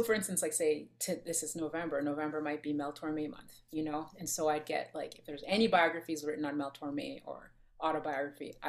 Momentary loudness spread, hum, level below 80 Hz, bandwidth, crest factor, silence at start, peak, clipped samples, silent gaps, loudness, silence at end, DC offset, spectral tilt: 12 LU; none; -68 dBFS; 15.5 kHz; 22 dB; 0 s; -14 dBFS; under 0.1%; none; -35 LUFS; 0 s; under 0.1%; -3.5 dB/octave